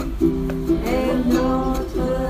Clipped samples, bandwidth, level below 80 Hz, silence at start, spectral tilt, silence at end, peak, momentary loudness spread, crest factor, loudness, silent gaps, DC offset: under 0.1%; 15.5 kHz; -28 dBFS; 0 s; -7 dB/octave; 0 s; -6 dBFS; 5 LU; 14 dB; -21 LUFS; none; under 0.1%